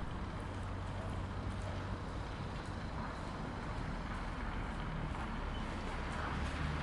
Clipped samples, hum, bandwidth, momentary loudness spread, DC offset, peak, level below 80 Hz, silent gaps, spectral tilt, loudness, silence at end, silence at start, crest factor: under 0.1%; none; 11.5 kHz; 4 LU; under 0.1%; -26 dBFS; -46 dBFS; none; -6 dB/octave; -42 LUFS; 0 s; 0 s; 14 dB